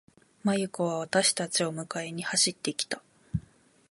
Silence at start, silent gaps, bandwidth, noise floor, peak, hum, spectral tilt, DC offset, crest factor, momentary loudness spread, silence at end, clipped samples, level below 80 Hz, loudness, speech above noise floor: 0.45 s; none; 11.5 kHz; -59 dBFS; -8 dBFS; none; -3 dB/octave; under 0.1%; 22 dB; 12 LU; 0.5 s; under 0.1%; -56 dBFS; -29 LUFS; 30 dB